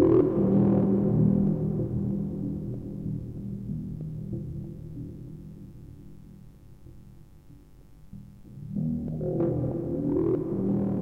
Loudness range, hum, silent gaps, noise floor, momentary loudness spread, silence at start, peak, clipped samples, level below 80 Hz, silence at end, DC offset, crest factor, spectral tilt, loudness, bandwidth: 20 LU; none; none; -51 dBFS; 24 LU; 0 s; -10 dBFS; under 0.1%; -48 dBFS; 0 s; under 0.1%; 18 dB; -12 dB/octave; -28 LUFS; 3.1 kHz